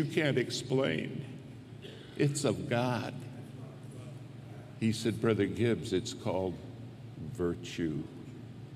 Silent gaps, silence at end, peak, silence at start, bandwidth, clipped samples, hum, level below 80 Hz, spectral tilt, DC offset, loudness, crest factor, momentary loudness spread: none; 0 s; -14 dBFS; 0 s; 15 kHz; under 0.1%; none; -64 dBFS; -5.5 dB/octave; under 0.1%; -33 LUFS; 20 dB; 17 LU